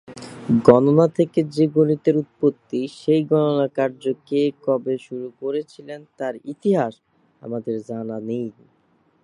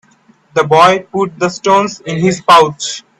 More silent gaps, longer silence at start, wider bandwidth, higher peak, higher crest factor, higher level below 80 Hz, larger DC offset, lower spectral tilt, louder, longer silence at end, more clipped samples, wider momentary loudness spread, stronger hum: neither; second, 0.1 s vs 0.55 s; second, 11 kHz vs 14 kHz; about the same, 0 dBFS vs 0 dBFS; first, 20 dB vs 12 dB; second, -62 dBFS vs -52 dBFS; neither; first, -8.5 dB/octave vs -4.5 dB/octave; second, -21 LUFS vs -11 LUFS; first, 0.7 s vs 0.2 s; second, under 0.1% vs 0.1%; first, 15 LU vs 10 LU; neither